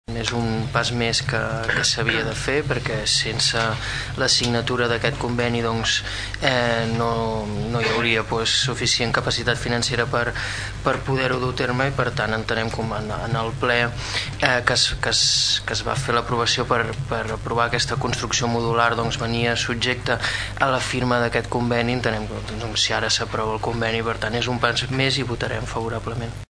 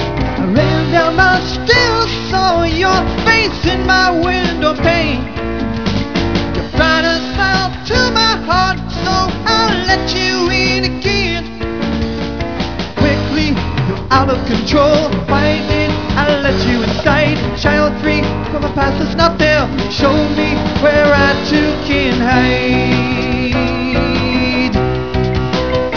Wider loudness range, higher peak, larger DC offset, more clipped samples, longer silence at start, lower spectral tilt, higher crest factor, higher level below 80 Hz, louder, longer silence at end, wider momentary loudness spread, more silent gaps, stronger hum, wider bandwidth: about the same, 3 LU vs 3 LU; about the same, -2 dBFS vs 0 dBFS; second, under 0.1% vs 2%; neither; about the same, 0.1 s vs 0 s; second, -3.5 dB/octave vs -5.5 dB/octave; first, 20 dB vs 14 dB; second, -38 dBFS vs -26 dBFS; second, -21 LUFS vs -13 LUFS; about the same, 0.05 s vs 0 s; about the same, 7 LU vs 7 LU; neither; neither; first, 11 kHz vs 5.4 kHz